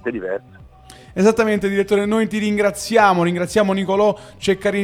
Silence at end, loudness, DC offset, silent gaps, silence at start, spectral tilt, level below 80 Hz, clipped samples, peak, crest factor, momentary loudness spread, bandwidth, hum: 0 s; -18 LUFS; under 0.1%; none; 0.05 s; -5.5 dB/octave; -48 dBFS; under 0.1%; 0 dBFS; 18 dB; 9 LU; 16 kHz; none